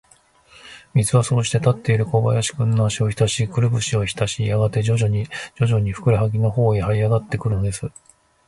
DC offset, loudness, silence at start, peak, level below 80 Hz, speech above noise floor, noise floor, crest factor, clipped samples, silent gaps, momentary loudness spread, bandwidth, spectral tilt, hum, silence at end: under 0.1%; -20 LUFS; 0.65 s; -4 dBFS; -42 dBFS; 35 dB; -54 dBFS; 16 dB; under 0.1%; none; 5 LU; 11.5 kHz; -5.5 dB/octave; none; 0.6 s